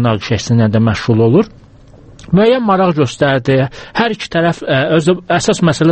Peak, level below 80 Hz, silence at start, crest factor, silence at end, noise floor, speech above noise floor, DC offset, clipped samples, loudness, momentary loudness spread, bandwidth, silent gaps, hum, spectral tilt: 0 dBFS; -42 dBFS; 0 s; 12 dB; 0 s; -40 dBFS; 28 dB; under 0.1%; under 0.1%; -13 LUFS; 5 LU; 8.8 kHz; none; none; -6 dB/octave